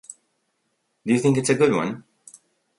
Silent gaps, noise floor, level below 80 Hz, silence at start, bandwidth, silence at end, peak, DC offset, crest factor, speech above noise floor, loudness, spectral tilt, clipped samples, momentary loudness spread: none; -73 dBFS; -64 dBFS; 0.1 s; 11.5 kHz; 0.8 s; -4 dBFS; under 0.1%; 20 dB; 53 dB; -21 LUFS; -5.5 dB/octave; under 0.1%; 18 LU